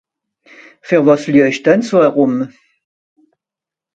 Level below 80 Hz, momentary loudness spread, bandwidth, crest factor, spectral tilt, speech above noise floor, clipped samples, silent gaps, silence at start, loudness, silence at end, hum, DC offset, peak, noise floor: -62 dBFS; 6 LU; 8 kHz; 16 dB; -6.5 dB/octave; 75 dB; under 0.1%; none; 0.85 s; -13 LUFS; 1.5 s; none; under 0.1%; 0 dBFS; -87 dBFS